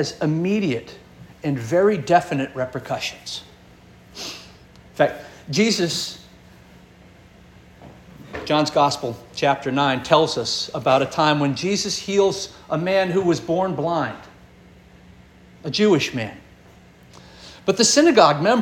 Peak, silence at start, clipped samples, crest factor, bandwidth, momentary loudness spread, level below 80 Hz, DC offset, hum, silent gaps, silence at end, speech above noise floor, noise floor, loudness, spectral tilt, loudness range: -2 dBFS; 0 s; under 0.1%; 20 dB; 17 kHz; 16 LU; -54 dBFS; under 0.1%; none; none; 0 s; 28 dB; -48 dBFS; -20 LUFS; -4 dB/octave; 6 LU